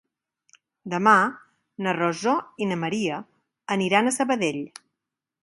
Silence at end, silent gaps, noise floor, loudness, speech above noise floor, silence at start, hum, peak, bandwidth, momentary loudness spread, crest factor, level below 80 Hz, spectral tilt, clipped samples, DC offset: 0.75 s; none; -86 dBFS; -23 LUFS; 63 dB; 0.85 s; none; -4 dBFS; 11.5 kHz; 16 LU; 22 dB; -72 dBFS; -4.5 dB/octave; under 0.1%; under 0.1%